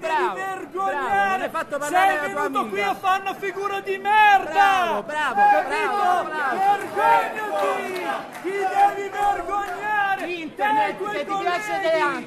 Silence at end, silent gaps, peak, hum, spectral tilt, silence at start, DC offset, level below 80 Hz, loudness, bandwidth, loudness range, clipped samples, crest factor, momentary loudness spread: 0 s; none; -4 dBFS; none; -3 dB/octave; 0 s; under 0.1%; -58 dBFS; -22 LUFS; 13.5 kHz; 4 LU; under 0.1%; 18 dB; 9 LU